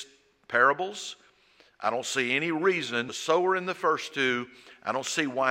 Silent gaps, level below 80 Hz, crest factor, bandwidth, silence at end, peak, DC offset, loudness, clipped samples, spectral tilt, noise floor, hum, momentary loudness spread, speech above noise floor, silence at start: none; -78 dBFS; 22 dB; 16 kHz; 0 s; -8 dBFS; under 0.1%; -27 LUFS; under 0.1%; -3 dB/octave; -61 dBFS; none; 12 LU; 34 dB; 0 s